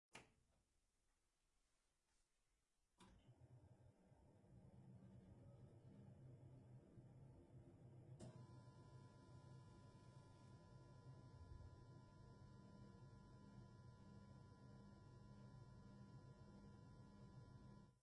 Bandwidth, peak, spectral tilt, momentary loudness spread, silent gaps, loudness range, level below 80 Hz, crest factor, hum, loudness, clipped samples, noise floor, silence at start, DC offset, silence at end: 10 kHz; -44 dBFS; -7 dB/octave; 3 LU; none; 2 LU; -76 dBFS; 22 dB; none; -66 LUFS; under 0.1%; -88 dBFS; 0.1 s; under 0.1%; 0 s